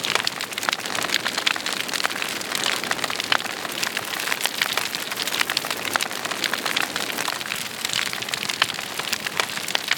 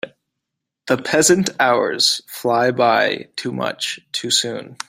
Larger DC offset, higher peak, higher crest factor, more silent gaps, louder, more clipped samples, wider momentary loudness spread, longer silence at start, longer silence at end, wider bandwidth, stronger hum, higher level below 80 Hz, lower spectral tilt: neither; about the same, 0 dBFS vs -2 dBFS; first, 26 dB vs 18 dB; neither; second, -23 LUFS vs -18 LUFS; neither; second, 3 LU vs 10 LU; about the same, 0 s vs 0.05 s; second, 0 s vs 0.15 s; first, over 20 kHz vs 16 kHz; neither; about the same, -66 dBFS vs -62 dBFS; second, -0.5 dB/octave vs -2.5 dB/octave